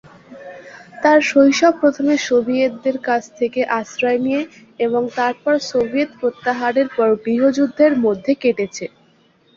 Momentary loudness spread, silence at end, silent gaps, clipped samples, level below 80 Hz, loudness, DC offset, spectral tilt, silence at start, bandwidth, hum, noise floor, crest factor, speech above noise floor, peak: 10 LU; 0.7 s; none; under 0.1%; -60 dBFS; -17 LUFS; under 0.1%; -4.5 dB/octave; 0.3 s; 7.6 kHz; none; -55 dBFS; 16 dB; 38 dB; -2 dBFS